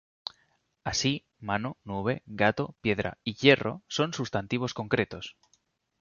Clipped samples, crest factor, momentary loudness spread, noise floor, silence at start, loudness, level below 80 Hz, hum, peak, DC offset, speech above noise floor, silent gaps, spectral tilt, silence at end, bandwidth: under 0.1%; 24 dB; 16 LU; -71 dBFS; 0.85 s; -29 LUFS; -56 dBFS; none; -6 dBFS; under 0.1%; 42 dB; none; -4.5 dB/octave; 0.7 s; 7.2 kHz